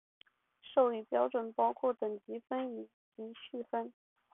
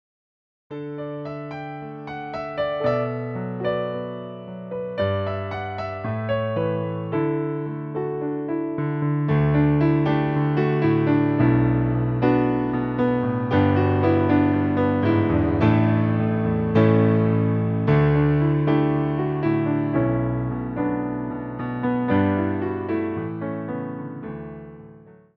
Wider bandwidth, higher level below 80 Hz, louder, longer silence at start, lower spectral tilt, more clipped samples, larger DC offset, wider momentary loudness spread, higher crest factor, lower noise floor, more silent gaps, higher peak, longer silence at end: second, 3.8 kHz vs 5.4 kHz; second, -86 dBFS vs -44 dBFS; second, -35 LUFS vs -22 LUFS; about the same, 0.65 s vs 0.7 s; second, -0.5 dB/octave vs -10.5 dB/octave; neither; neither; first, 17 LU vs 13 LU; about the same, 20 dB vs 18 dB; first, -60 dBFS vs -47 dBFS; first, 2.94-3.12 s vs none; second, -16 dBFS vs -4 dBFS; first, 0.45 s vs 0.25 s